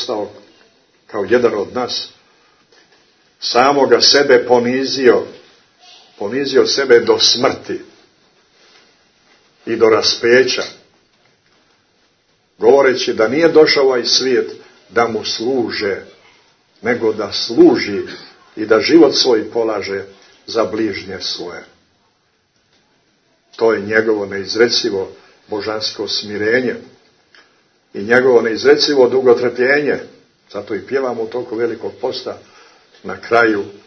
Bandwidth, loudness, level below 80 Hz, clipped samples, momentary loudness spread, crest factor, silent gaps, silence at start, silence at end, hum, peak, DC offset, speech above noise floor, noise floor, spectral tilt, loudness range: 6.6 kHz; -14 LUFS; -62 dBFS; under 0.1%; 17 LU; 16 dB; none; 0 s; 0.1 s; none; 0 dBFS; under 0.1%; 46 dB; -61 dBFS; -3.5 dB/octave; 8 LU